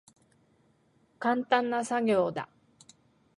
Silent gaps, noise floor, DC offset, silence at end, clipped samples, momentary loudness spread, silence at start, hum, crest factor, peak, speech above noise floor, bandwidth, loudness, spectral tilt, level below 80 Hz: none; -67 dBFS; under 0.1%; 0.95 s; under 0.1%; 10 LU; 1.2 s; none; 22 dB; -10 dBFS; 40 dB; 11.5 kHz; -29 LUFS; -5 dB/octave; -74 dBFS